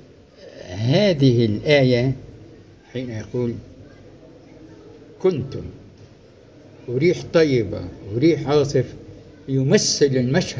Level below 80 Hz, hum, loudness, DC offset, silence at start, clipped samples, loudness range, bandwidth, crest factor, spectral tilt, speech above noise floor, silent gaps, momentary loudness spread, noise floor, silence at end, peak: -48 dBFS; none; -20 LUFS; under 0.1%; 0.4 s; under 0.1%; 10 LU; 8 kHz; 18 dB; -5.5 dB/octave; 29 dB; none; 18 LU; -47 dBFS; 0 s; -4 dBFS